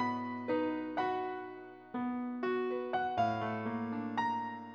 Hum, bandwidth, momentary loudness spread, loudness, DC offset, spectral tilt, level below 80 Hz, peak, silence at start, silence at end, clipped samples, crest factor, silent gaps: none; 6.8 kHz; 7 LU; -36 LUFS; under 0.1%; -7 dB/octave; -74 dBFS; -20 dBFS; 0 s; 0 s; under 0.1%; 16 dB; none